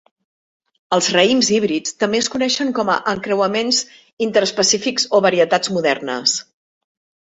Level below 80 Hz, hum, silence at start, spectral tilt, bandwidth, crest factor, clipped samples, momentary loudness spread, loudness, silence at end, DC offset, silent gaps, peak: -60 dBFS; none; 0.9 s; -2.5 dB/octave; 8.2 kHz; 18 dB; under 0.1%; 6 LU; -17 LUFS; 0.85 s; under 0.1%; 4.13-4.17 s; 0 dBFS